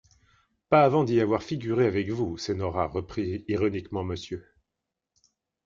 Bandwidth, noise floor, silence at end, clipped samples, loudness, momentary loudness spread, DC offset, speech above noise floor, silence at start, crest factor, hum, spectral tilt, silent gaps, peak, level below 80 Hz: 7.6 kHz; -86 dBFS; 1.25 s; under 0.1%; -26 LUFS; 12 LU; under 0.1%; 60 dB; 0.7 s; 22 dB; none; -7 dB/octave; none; -6 dBFS; -58 dBFS